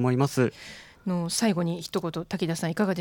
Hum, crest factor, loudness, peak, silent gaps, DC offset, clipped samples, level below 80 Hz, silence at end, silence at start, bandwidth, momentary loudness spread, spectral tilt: none; 18 dB; -28 LUFS; -10 dBFS; none; under 0.1%; under 0.1%; -62 dBFS; 0 s; 0 s; 19 kHz; 9 LU; -5.5 dB/octave